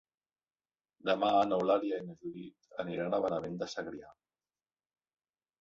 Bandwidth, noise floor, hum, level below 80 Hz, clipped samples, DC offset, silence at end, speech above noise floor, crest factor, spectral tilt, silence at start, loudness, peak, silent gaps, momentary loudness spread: 7.8 kHz; under -90 dBFS; none; -74 dBFS; under 0.1%; under 0.1%; 1.5 s; over 57 dB; 20 dB; -6 dB/octave; 1.05 s; -33 LUFS; -16 dBFS; none; 16 LU